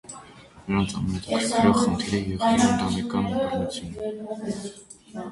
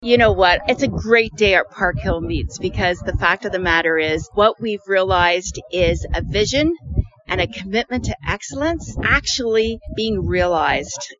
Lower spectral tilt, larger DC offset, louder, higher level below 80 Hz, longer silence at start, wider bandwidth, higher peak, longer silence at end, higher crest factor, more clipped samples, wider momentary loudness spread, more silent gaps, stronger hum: about the same, -5 dB/octave vs -4.5 dB/octave; neither; second, -25 LUFS vs -18 LUFS; second, -46 dBFS vs -32 dBFS; about the same, 0.05 s vs 0 s; first, 11.5 kHz vs 7.6 kHz; second, -6 dBFS vs -2 dBFS; about the same, 0 s vs 0.05 s; about the same, 20 dB vs 18 dB; neither; first, 19 LU vs 9 LU; neither; neither